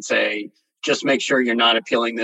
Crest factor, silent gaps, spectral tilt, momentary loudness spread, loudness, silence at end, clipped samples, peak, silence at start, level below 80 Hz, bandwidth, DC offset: 16 dB; none; -2.5 dB/octave; 13 LU; -19 LUFS; 0 s; under 0.1%; -4 dBFS; 0 s; -82 dBFS; 10 kHz; under 0.1%